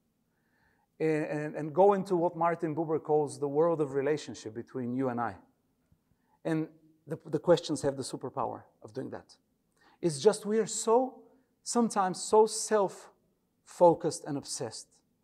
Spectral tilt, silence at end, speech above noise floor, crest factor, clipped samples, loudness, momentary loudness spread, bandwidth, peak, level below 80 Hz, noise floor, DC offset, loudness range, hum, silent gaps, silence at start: -5 dB/octave; 0.4 s; 46 dB; 22 dB; under 0.1%; -30 LUFS; 16 LU; 13.5 kHz; -10 dBFS; -72 dBFS; -75 dBFS; under 0.1%; 5 LU; none; none; 1 s